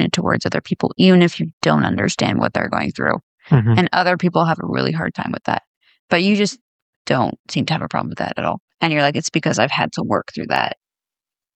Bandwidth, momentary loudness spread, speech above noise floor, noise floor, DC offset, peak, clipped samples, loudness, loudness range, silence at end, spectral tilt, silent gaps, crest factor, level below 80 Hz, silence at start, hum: 9 kHz; 8 LU; 72 dB; -89 dBFS; under 0.1%; -2 dBFS; under 0.1%; -18 LUFS; 4 LU; 0.8 s; -5.5 dB/octave; 1.53-1.61 s, 3.23-3.38 s, 5.67-5.81 s, 5.99-6.08 s, 6.61-7.05 s, 7.39-7.44 s, 8.60-8.68 s, 8.74-8.78 s; 16 dB; -54 dBFS; 0 s; none